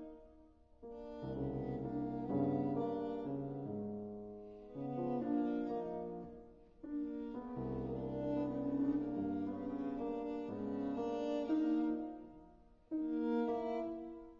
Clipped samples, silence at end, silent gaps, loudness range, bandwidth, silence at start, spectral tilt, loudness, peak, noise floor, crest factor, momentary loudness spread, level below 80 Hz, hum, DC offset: under 0.1%; 0 s; none; 3 LU; 6.8 kHz; 0 s; -8.5 dB/octave; -40 LUFS; -26 dBFS; -64 dBFS; 14 dB; 14 LU; -62 dBFS; none; under 0.1%